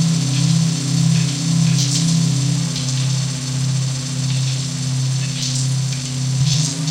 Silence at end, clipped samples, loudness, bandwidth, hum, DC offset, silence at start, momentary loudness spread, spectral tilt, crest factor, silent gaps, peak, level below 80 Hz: 0 s; under 0.1%; -18 LUFS; 13.5 kHz; none; under 0.1%; 0 s; 5 LU; -4.5 dB/octave; 12 dB; none; -6 dBFS; -50 dBFS